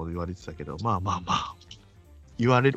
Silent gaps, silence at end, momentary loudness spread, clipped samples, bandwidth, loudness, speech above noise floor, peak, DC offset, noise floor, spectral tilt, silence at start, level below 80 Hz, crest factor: none; 0 s; 23 LU; under 0.1%; 8.2 kHz; -28 LUFS; 25 dB; -6 dBFS; under 0.1%; -52 dBFS; -6 dB/octave; 0 s; -50 dBFS; 20 dB